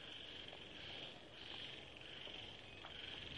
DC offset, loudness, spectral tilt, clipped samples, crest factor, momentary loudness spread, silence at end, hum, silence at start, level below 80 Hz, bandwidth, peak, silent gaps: under 0.1%; -51 LUFS; -3.5 dB/octave; under 0.1%; 18 dB; 4 LU; 0 s; none; 0 s; -72 dBFS; 11 kHz; -36 dBFS; none